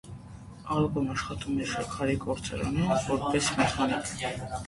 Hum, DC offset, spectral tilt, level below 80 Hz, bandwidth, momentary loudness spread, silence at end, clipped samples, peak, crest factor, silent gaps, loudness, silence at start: none; under 0.1%; -5 dB/octave; -48 dBFS; 11.5 kHz; 7 LU; 0 s; under 0.1%; -12 dBFS; 18 dB; none; -29 LUFS; 0.05 s